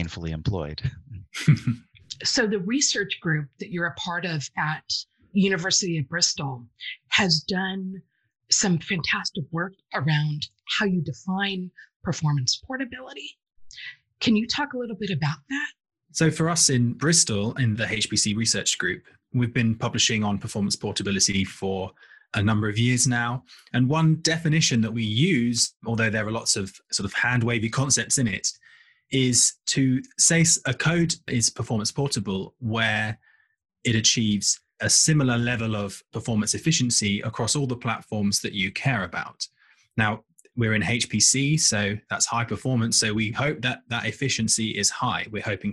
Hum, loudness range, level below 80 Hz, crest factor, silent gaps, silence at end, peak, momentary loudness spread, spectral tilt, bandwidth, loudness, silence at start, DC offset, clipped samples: none; 5 LU; -54 dBFS; 20 dB; 11.96-12.00 s; 0 s; -4 dBFS; 12 LU; -3.5 dB/octave; 12.5 kHz; -23 LUFS; 0 s; under 0.1%; under 0.1%